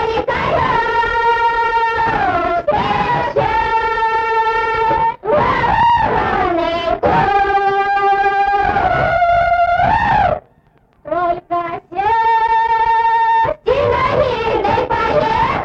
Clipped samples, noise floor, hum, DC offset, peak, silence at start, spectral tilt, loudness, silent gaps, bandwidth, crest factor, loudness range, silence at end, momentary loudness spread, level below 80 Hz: under 0.1%; -53 dBFS; none; under 0.1%; -4 dBFS; 0 s; -6 dB/octave; -15 LUFS; none; 7.6 kHz; 12 dB; 2 LU; 0 s; 4 LU; -36 dBFS